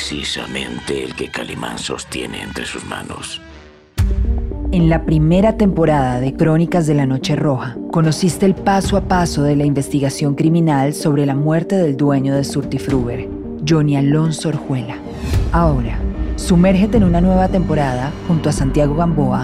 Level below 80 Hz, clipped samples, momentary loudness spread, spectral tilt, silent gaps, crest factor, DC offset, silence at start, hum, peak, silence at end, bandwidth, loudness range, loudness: -26 dBFS; under 0.1%; 11 LU; -6.5 dB/octave; none; 12 dB; under 0.1%; 0 s; none; -2 dBFS; 0 s; 14 kHz; 8 LU; -17 LUFS